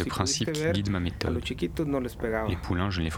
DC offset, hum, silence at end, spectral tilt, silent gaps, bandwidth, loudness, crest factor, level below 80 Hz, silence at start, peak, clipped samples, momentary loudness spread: under 0.1%; none; 0 s; -5 dB/octave; none; 17.5 kHz; -29 LUFS; 22 dB; -42 dBFS; 0 s; -8 dBFS; under 0.1%; 4 LU